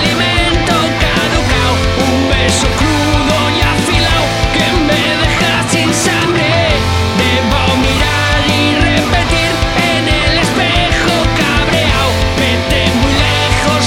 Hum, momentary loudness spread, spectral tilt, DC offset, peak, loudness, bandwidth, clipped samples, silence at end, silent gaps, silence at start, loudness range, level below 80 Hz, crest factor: none; 1 LU; -4 dB/octave; under 0.1%; 0 dBFS; -11 LUFS; 16.5 kHz; under 0.1%; 0 s; none; 0 s; 0 LU; -20 dBFS; 12 dB